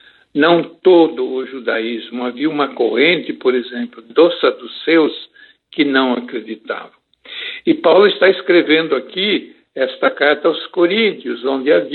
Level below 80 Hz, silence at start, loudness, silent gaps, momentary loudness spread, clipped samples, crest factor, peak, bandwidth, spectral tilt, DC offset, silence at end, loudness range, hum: -74 dBFS; 0.35 s; -15 LUFS; none; 14 LU; under 0.1%; 16 dB; 0 dBFS; 4.4 kHz; -8 dB/octave; under 0.1%; 0 s; 4 LU; none